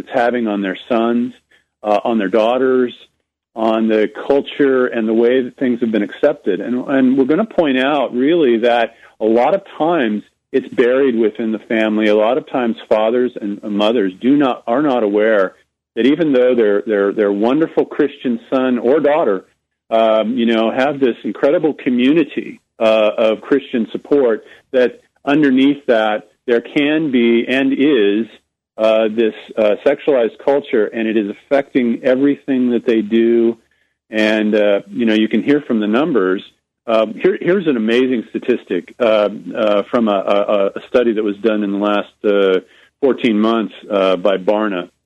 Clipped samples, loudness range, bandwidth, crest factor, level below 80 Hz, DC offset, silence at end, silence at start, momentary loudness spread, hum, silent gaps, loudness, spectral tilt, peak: under 0.1%; 2 LU; 8.4 kHz; 12 dB; -62 dBFS; under 0.1%; 0.2 s; 0.1 s; 6 LU; none; none; -16 LUFS; -7 dB/octave; -2 dBFS